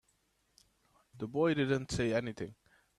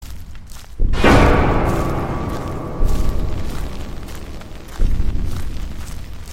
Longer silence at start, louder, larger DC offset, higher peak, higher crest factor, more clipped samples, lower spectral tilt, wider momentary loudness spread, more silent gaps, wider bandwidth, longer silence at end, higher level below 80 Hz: first, 1.15 s vs 0 s; second, -34 LUFS vs -20 LUFS; neither; second, -18 dBFS vs 0 dBFS; about the same, 18 dB vs 18 dB; neither; about the same, -6 dB/octave vs -6.5 dB/octave; second, 15 LU vs 21 LU; neither; second, 13 kHz vs 15 kHz; first, 0.45 s vs 0 s; second, -60 dBFS vs -20 dBFS